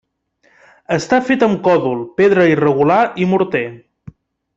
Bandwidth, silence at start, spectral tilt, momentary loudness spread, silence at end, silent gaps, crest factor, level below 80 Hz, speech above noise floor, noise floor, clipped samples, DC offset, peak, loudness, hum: 8 kHz; 0.9 s; -6.5 dB/octave; 9 LU; 0.8 s; none; 14 dB; -54 dBFS; 45 dB; -59 dBFS; under 0.1%; under 0.1%; -2 dBFS; -14 LUFS; none